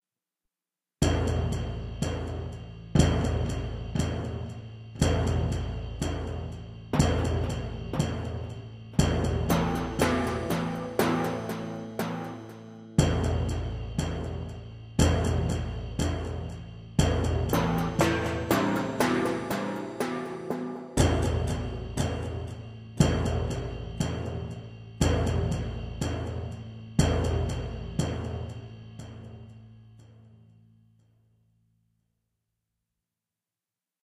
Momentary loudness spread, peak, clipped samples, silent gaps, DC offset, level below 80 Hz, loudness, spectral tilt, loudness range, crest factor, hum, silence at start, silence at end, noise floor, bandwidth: 14 LU; -8 dBFS; under 0.1%; none; under 0.1%; -38 dBFS; -29 LUFS; -6 dB/octave; 4 LU; 22 dB; none; 1 s; 3.8 s; under -90 dBFS; 15.5 kHz